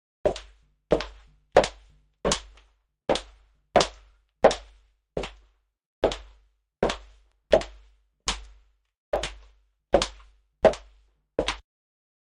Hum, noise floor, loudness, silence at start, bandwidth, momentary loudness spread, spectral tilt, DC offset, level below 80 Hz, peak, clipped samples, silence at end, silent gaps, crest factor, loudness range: none; -62 dBFS; -27 LUFS; 0.25 s; 11.5 kHz; 15 LU; -3.5 dB/octave; under 0.1%; -44 dBFS; -2 dBFS; under 0.1%; 0.75 s; 5.86-6.02 s, 8.97-9.12 s; 26 dB; 3 LU